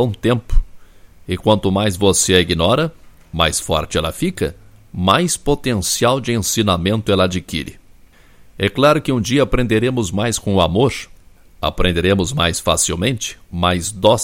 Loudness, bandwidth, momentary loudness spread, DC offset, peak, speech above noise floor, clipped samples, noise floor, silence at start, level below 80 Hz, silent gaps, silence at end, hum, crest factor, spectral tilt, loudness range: -17 LUFS; 16.5 kHz; 10 LU; under 0.1%; 0 dBFS; 29 dB; under 0.1%; -45 dBFS; 0 s; -30 dBFS; none; 0 s; none; 18 dB; -4 dB/octave; 2 LU